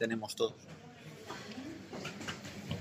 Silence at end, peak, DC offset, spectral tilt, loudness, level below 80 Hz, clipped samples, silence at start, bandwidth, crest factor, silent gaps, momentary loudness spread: 0 s; -18 dBFS; under 0.1%; -4.5 dB/octave; -41 LUFS; -70 dBFS; under 0.1%; 0 s; 15.5 kHz; 22 dB; none; 15 LU